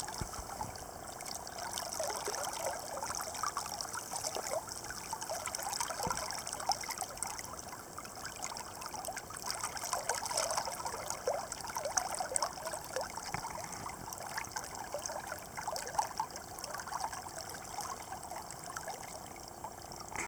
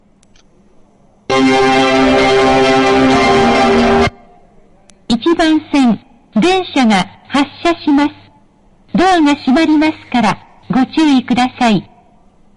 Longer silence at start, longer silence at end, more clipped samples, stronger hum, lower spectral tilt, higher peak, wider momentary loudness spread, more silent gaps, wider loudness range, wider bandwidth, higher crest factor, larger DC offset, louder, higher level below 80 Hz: second, 0 s vs 1.3 s; second, 0 s vs 0.75 s; neither; neither; second, -1.5 dB/octave vs -5 dB/octave; second, -12 dBFS vs -2 dBFS; about the same, 9 LU vs 7 LU; neither; about the same, 4 LU vs 4 LU; first, over 20 kHz vs 11 kHz; first, 28 dB vs 10 dB; neither; second, -39 LUFS vs -12 LUFS; second, -62 dBFS vs -38 dBFS